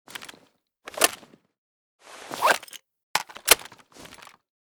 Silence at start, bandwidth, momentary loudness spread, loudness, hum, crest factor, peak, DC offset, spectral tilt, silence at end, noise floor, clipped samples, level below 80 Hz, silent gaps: 0.2 s; over 20 kHz; 26 LU; -23 LUFS; none; 30 dB; 0 dBFS; under 0.1%; 1 dB/octave; 1.1 s; -62 dBFS; under 0.1%; -60 dBFS; 1.58-1.99 s, 3.03-3.14 s